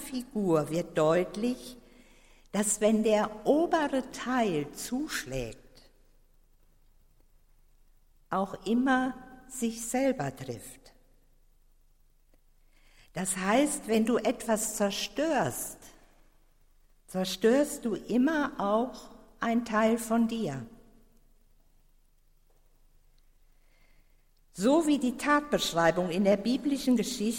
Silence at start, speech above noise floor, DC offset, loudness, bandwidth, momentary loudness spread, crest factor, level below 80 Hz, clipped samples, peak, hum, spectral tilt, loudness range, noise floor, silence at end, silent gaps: 0 s; 35 dB; under 0.1%; -29 LUFS; 16.5 kHz; 12 LU; 20 dB; -58 dBFS; under 0.1%; -12 dBFS; none; -4.5 dB/octave; 10 LU; -63 dBFS; 0 s; none